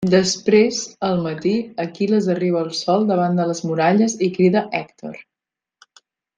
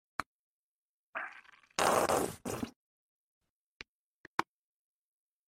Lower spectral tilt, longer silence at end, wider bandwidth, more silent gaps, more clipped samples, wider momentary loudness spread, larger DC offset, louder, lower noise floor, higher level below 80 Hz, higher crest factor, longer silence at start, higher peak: first, -5.5 dB/octave vs -3 dB/octave; about the same, 1.15 s vs 1.15 s; second, 9.8 kHz vs 16 kHz; second, none vs 0.26-1.13 s, 2.76-3.41 s, 3.50-3.80 s, 3.88-4.38 s; neither; second, 10 LU vs 24 LU; neither; first, -19 LUFS vs -35 LUFS; first, -87 dBFS vs -57 dBFS; about the same, -62 dBFS vs -66 dBFS; second, 16 dB vs 28 dB; second, 0 s vs 0.2 s; first, -2 dBFS vs -12 dBFS